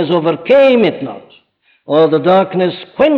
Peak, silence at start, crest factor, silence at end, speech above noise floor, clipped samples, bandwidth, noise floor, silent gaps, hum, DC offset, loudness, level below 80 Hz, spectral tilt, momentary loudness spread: -2 dBFS; 0 s; 12 dB; 0 s; 44 dB; under 0.1%; 5.6 kHz; -55 dBFS; none; none; under 0.1%; -12 LUFS; -54 dBFS; -8 dB/octave; 9 LU